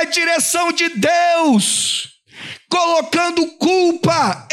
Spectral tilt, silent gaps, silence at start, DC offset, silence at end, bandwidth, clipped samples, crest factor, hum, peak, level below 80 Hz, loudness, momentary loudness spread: -3 dB/octave; none; 0 s; under 0.1%; 0.1 s; 15.5 kHz; under 0.1%; 12 dB; none; -4 dBFS; -60 dBFS; -15 LUFS; 8 LU